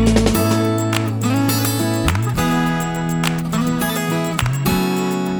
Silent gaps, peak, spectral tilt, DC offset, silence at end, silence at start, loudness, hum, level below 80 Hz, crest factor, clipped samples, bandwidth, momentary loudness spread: none; 0 dBFS; -5.5 dB/octave; under 0.1%; 0 s; 0 s; -18 LUFS; none; -32 dBFS; 16 dB; under 0.1%; over 20 kHz; 4 LU